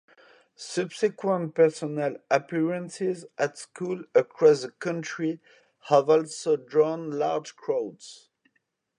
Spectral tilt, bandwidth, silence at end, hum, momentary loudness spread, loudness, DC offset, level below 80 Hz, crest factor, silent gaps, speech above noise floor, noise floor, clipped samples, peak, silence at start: -5.5 dB/octave; 10.5 kHz; 0.85 s; none; 12 LU; -26 LUFS; under 0.1%; -82 dBFS; 20 dB; none; 49 dB; -75 dBFS; under 0.1%; -6 dBFS; 0.6 s